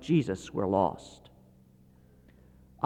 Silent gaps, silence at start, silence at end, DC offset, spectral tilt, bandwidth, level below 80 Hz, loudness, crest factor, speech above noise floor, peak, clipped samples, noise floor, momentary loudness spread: none; 0 s; 0 s; under 0.1%; -7.5 dB/octave; 9.8 kHz; -60 dBFS; -29 LUFS; 20 dB; 30 dB; -12 dBFS; under 0.1%; -59 dBFS; 19 LU